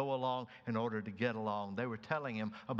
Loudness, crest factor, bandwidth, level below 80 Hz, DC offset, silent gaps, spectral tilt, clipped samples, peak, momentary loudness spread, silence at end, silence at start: -39 LUFS; 20 dB; 7.2 kHz; -80 dBFS; under 0.1%; none; -7.5 dB/octave; under 0.1%; -18 dBFS; 5 LU; 0 s; 0 s